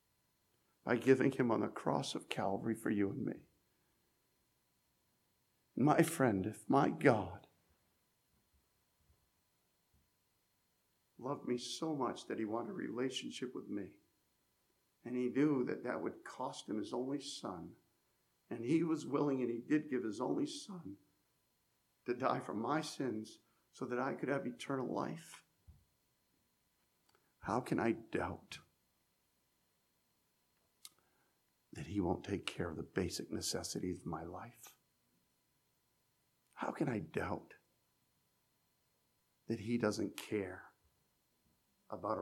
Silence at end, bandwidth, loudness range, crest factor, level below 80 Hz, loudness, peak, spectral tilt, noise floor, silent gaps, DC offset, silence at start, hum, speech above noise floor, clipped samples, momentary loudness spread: 0 s; 16 kHz; 9 LU; 26 dB; -74 dBFS; -39 LUFS; -14 dBFS; -5.5 dB/octave; -80 dBFS; none; under 0.1%; 0.85 s; none; 42 dB; under 0.1%; 17 LU